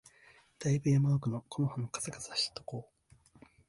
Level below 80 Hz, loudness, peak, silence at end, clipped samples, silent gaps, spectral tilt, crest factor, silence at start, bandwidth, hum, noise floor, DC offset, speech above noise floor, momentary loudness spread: -66 dBFS; -33 LUFS; -20 dBFS; 0.85 s; under 0.1%; none; -5.5 dB/octave; 16 dB; 0.6 s; 11.5 kHz; none; -63 dBFS; under 0.1%; 30 dB; 13 LU